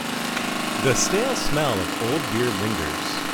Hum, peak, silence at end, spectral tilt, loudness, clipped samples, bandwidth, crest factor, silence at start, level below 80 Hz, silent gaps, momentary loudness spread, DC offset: none; -8 dBFS; 0 s; -3.5 dB/octave; -23 LUFS; under 0.1%; over 20 kHz; 14 dB; 0 s; -42 dBFS; none; 5 LU; under 0.1%